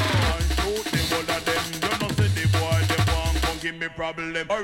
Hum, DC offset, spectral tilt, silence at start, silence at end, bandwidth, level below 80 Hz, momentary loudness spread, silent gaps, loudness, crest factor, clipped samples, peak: none; under 0.1%; -4.5 dB/octave; 0 s; 0 s; 17 kHz; -32 dBFS; 7 LU; none; -24 LUFS; 14 dB; under 0.1%; -8 dBFS